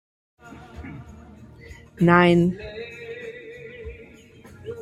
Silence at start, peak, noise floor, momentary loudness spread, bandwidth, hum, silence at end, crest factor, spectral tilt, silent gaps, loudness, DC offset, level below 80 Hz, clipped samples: 0.8 s; -2 dBFS; -47 dBFS; 28 LU; 8.8 kHz; none; 0 s; 24 dB; -7.5 dB/octave; none; -19 LUFS; under 0.1%; -50 dBFS; under 0.1%